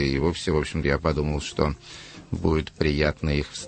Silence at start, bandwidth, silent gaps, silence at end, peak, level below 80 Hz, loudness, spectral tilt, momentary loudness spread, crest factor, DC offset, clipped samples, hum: 0 s; 8.8 kHz; none; 0 s; -6 dBFS; -34 dBFS; -25 LUFS; -6 dB/octave; 10 LU; 20 dB; under 0.1%; under 0.1%; none